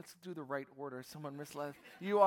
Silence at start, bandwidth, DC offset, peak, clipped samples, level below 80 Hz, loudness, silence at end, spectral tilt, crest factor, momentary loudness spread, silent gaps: 0.05 s; 17.5 kHz; under 0.1%; -16 dBFS; under 0.1%; -86 dBFS; -44 LUFS; 0 s; -5.5 dB/octave; 22 dB; 5 LU; none